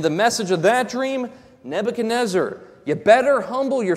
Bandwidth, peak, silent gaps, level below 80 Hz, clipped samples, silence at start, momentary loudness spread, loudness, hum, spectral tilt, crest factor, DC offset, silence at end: 15 kHz; -2 dBFS; none; -62 dBFS; under 0.1%; 0 s; 13 LU; -20 LUFS; none; -4.5 dB/octave; 18 dB; under 0.1%; 0 s